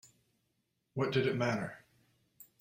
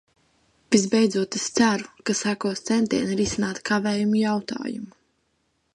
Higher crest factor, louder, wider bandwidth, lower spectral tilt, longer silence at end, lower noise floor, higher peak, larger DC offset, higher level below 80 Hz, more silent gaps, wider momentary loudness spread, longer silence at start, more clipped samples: about the same, 20 dB vs 20 dB; second, -35 LUFS vs -23 LUFS; first, 16 kHz vs 11.5 kHz; first, -6.5 dB/octave vs -4 dB/octave; second, 0.15 s vs 0.85 s; first, -81 dBFS vs -71 dBFS; second, -18 dBFS vs -4 dBFS; neither; second, -70 dBFS vs -56 dBFS; neither; first, 13 LU vs 9 LU; first, 0.95 s vs 0.7 s; neither